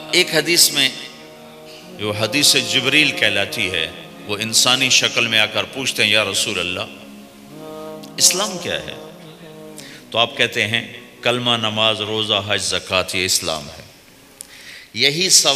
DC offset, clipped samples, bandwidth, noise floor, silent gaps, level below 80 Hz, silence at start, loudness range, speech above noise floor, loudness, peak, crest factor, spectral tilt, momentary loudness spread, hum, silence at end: under 0.1%; under 0.1%; 15.5 kHz; -46 dBFS; none; -58 dBFS; 0 s; 5 LU; 28 dB; -16 LUFS; 0 dBFS; 20 dB; -1.5 dB/octave; 22 LU; none; 0 s